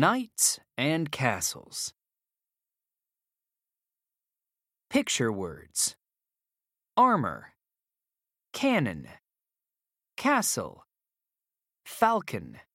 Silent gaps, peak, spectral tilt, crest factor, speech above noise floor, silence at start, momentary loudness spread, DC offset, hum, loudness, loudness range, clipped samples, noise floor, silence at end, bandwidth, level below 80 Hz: none; -6 dBFS; -3.5 dB/octave; 24 dB; over 62 dB; 0 s; 14 LU; under 0.1%; none; -28 LUFS; 7 LU; under 0.1%; under -90 dBFS; 0.15 s; 16.5 kHz; -66 dBFS